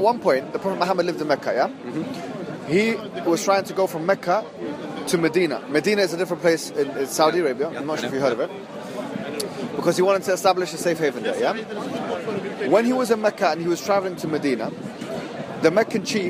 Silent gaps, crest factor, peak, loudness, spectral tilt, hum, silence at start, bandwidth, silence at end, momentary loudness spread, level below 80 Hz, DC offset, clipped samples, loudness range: none; 20 dB; -4 dBFS; -23 LUFS; -4.5 dB/octave; none; 0 s; 15.5 kHz; 0 s; 11 LU; -68 dBFS; under 0.1%; under 0.1%; 2 LU